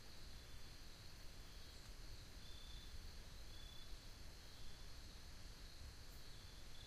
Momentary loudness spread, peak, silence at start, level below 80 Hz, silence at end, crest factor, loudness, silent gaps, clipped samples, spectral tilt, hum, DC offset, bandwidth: 2 LU; -40 dBFS; 0 s; -58 dBFS; 0 s; 14 dB; -59 LUFS; none; under 0.1%; -3 dB/octave; none; under 0.1%; 15.5 kHz